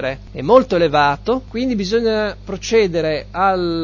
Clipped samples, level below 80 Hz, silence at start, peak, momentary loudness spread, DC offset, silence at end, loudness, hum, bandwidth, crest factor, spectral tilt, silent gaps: under 0.1%; -38 dBFS; 0 s; 0 dBFS; 9 LU; under 0.1%; 0 s; -17 LUFS; none; 7.2 kHz; 16 dB; -5.5 dB/octave; none